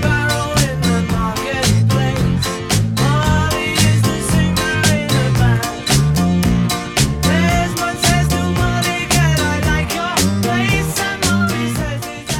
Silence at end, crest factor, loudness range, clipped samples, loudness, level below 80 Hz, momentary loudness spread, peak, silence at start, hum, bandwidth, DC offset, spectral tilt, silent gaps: 0 s; 14 dB; 1 LU; under 0.1%; -16 LUFS; -28 dBFS; 4 LU; -2 dBFS; 0 s; none; 18 kHz; under 0.1%; -4.5 dB/octave; none